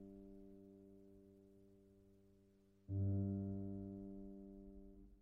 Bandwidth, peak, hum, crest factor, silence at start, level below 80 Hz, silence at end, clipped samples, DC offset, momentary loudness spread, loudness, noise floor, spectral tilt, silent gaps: 1.5 kHz; -32 dBFS; none; 18 dB; 0 s; -68 dBFS; 0 s; under 0.1%; under 0.1%; 25 LU; -47 LUFS; -72 dBFS; -14 dB/octave; none